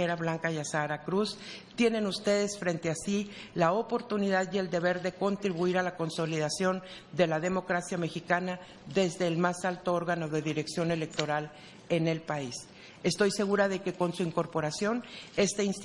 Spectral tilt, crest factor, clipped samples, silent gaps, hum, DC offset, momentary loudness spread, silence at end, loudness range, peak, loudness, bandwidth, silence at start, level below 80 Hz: -5 dB/octave; 20 dB; under 0.1%; none; none; under 0.1%; 7 LU; 0 s; 1 LU; -10 dBFS; -31 LUFS; 11.5 kHz; 0 s; -66 dBFS